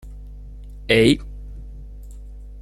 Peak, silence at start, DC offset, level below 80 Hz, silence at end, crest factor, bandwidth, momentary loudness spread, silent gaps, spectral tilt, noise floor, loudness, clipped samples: -2 dBFS; 0.05 s; under 0.1%; -36 dBFS; 0 s; 22 dB; 13.5 kHz; 25 LU; none; -5.5 dB/octave; -37 dBFS; -18 LUFS; under 0.1%